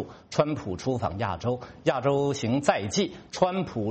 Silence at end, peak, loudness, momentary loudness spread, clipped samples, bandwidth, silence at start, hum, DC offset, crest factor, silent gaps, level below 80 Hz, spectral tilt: 0 s; -6 dBFS; -27 LUFS; 6 LU; under 0.1%; 8.4 kHz; 0 s; none; under 0.1%; 20 dB; none; -56 dBFS; -5.5 dB/octave